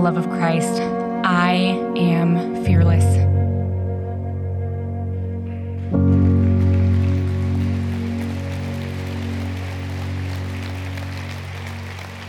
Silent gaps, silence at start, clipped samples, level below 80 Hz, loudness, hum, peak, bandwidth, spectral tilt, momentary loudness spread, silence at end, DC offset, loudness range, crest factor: none; 0 s; under 0.1%; -42 dBFS; -21 LUFS; none; -4 dBFS; 11.5 kHz; -7.5 dB/octave; 12 LU; 0 s; under 0.1%; 9 LU; 14 dB